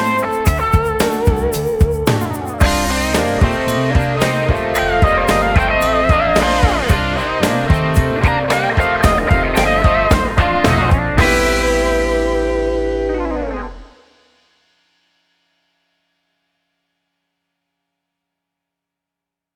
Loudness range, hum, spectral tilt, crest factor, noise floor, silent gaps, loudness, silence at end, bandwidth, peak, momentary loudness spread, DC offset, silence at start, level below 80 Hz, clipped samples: 7 LU; none; -5.5 dB/octave; 16 dB; -84 dBFS; none; -15 LUFS; 5.7 s; over 20 kHz; 0 dBFS; 5 LU; under 0.1%; 0 s; -24 dBFS; under 0.1%